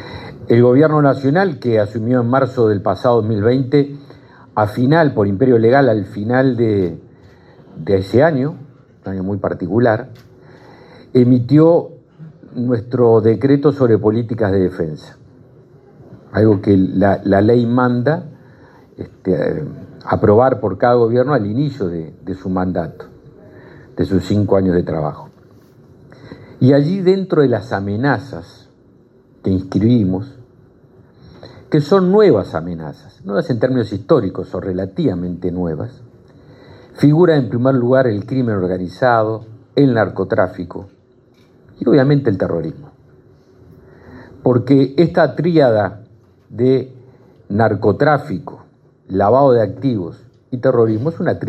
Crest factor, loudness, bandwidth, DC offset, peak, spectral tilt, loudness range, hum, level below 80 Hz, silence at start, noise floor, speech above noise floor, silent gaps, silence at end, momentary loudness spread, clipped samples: 16 dB; -15 LUFS; 8.2 kHz; under 0.1%; 0 dBFS; -9.5 dB/octave; 5 LU; none; -54 dBFS; 0 s; -50 dBFS; 36 dB; none; 0 s; 15 LU; under 0.1%